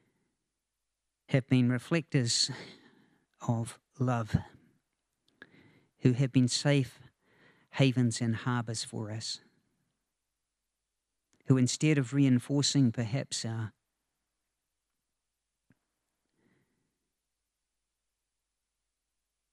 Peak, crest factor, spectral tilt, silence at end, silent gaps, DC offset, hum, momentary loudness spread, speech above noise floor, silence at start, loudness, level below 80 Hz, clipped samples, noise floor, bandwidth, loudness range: -10 dBFS; 22 dB; -5 dB/octave; 5.85 s; none; under 0.1%; none; 12 LU; 58 dB; 1.3 s; -30 LUFS; -64 dBFS; under 0.1%; -87 dBFS; 12 kHz; 8 LU